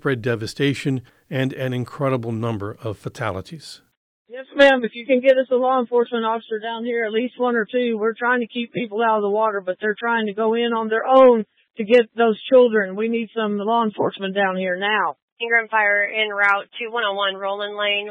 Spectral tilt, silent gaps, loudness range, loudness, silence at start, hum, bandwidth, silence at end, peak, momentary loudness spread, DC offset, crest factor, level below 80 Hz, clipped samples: -6 dB/octave; 3.97-4.25 s, 15.22-15.37 s; 7 LU; -20 LUFS; 0.05 s; none; 10.5 kHz; 0 s; -4 dBFS; 12 LU; under 0.1%; 16 dB; -64 dBFS; under 0.1%